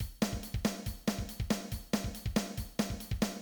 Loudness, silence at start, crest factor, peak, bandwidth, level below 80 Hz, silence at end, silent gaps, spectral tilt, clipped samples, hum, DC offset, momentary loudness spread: -36 LUFS; 0 s; 18 dB; -18 dBFS; over 20 kHz; -44 dBFS; 0 s; none; -5 dB/octave; under 0.1%; none; under 0.1%; 2 LU